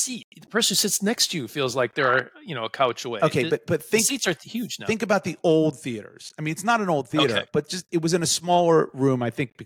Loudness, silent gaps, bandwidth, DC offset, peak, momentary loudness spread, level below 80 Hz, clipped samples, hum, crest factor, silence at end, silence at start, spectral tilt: -23 LUFS; 0.24-0.32 s; 17.5 kHz; under 0.1%; -8 dBFS; 11 LU; -66 dBFS; under 0.1%; none; 16 dB; 0 s; 0 s; -3.5 dB/octave